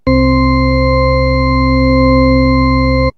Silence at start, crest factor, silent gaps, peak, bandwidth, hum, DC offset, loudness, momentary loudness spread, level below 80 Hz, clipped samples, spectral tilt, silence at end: 0.05 s; 10 dB; none; 0 dBFS; 6 kHz; none; under 0.1%; -11 LUFS; 2 LU; -16 dBFS; under 0.1%; -9 dB/octave; 0.05 s